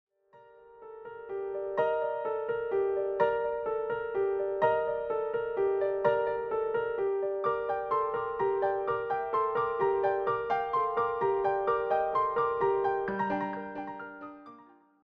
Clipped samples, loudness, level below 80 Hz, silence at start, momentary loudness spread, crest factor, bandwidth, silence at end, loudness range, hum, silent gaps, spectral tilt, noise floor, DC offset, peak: under 0.1%; -30 LUFS; -64 dBFS; 0.35 s; 10 LU; 18 dB; 5.2 kHz; 0.45 s; 3 LU; none; none; -8 dB/octave; -58 dBFS; under 0.1%; -14 dBFS